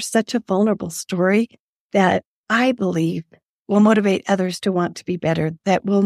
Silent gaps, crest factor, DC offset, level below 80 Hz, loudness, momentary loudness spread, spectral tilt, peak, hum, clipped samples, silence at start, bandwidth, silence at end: 1.60-1.90 s, 2.25-2.44 s, 3.46-3.65 s; 18 dB; under 0.1%; -60 dBFS; -20 LUFS; 8 LU; -5.5 dB/octave; -2 dBFS; none; under 0.1%; 0 s; 14.5 kHz; 0 s